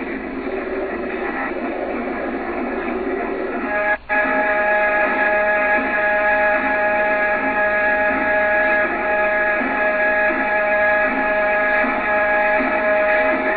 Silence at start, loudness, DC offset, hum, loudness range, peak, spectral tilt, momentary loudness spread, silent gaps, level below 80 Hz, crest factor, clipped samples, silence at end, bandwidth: 0 s; -18 LUFS; under 0.1%; none; 6 LU; -6 dBFS; -8 dB/octave; 8 LU; none; -44 dBFS; 12 dB; under 0.1%; 0 s; 4.7 kHz